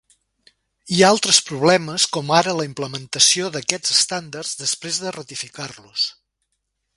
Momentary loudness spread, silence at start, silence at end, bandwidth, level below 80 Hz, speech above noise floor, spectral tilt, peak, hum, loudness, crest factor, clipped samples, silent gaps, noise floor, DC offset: 14 LU; 0.85 s; 0.85 s; 11.5 kHz; -62 dBFS; 55 dB; -2 dB/octave; 0 dBFS; none; -18 LUFS; 22 dB; under 0.1%; none; -75 dBFS; under 0.1%